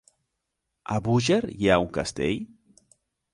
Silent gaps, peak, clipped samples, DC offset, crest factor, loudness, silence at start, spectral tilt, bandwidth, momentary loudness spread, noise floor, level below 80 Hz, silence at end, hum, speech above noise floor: none; -6 dBFS; under 0.1%; under 0.1%; 22 dB; -25 LUFS; 0.9 s; -5.5 dB/octave; 11.5 kHz; 12 LU; -81 dBFS; -50 dBFS; 0.9 s; none; 57 dB